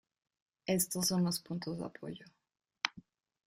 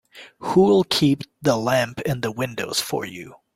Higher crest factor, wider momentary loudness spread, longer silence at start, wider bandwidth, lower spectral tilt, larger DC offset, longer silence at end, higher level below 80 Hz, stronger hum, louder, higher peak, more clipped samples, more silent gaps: first, 28 dB vs 18 dB; first, 15 LU vs 12 LU; first, 0.65 s vs 0.15 s; about the same, 15.5 kHz vs 16.5 kHz; about the same, -4 dB/octave vs -5 dB/octave; neither; first, 0.45 s vs 0.2 s; second, -72 dBFS vs -56 dBFS; neither; second, -35 LUFS vs -21 LUFS; second, -10 dBFS vs -4 dBFS; neither; neither